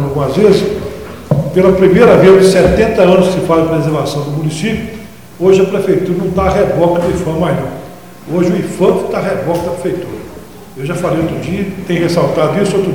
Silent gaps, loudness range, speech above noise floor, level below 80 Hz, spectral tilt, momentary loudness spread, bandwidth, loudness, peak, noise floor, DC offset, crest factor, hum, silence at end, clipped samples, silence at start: none; 8 LU; 21 dB; -34 dBFS; -6.5 dB/octave; 16 LU; 18.5 kHz; -12 LUFS; 0 dBFS; -32 dBFS; 1%; 12 dB; none; 0 s; 0.3%; 0 s